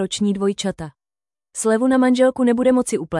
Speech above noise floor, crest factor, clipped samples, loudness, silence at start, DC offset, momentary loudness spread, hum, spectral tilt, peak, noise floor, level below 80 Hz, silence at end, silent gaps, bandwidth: over 72 dB; 14 dB; under 0.1%; -18 LUFS; 0 s; under 0.1%; 14 LU; none; -5 dB/octave; -6 dBFS; under -90 dBFS; -54 dBFS; 0 s; none; 12 kHz